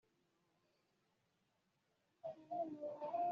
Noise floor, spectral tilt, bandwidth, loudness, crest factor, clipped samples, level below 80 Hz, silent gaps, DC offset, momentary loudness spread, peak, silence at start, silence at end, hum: -83 dBFS; -6 dB/octave; 6.8 kHz; -47 LUFS; 16 dB; under 0.1%; under -90 dBFS; none; under 0.1%; 10 LU; -32 dBFS; 2.25 s; 0 s; none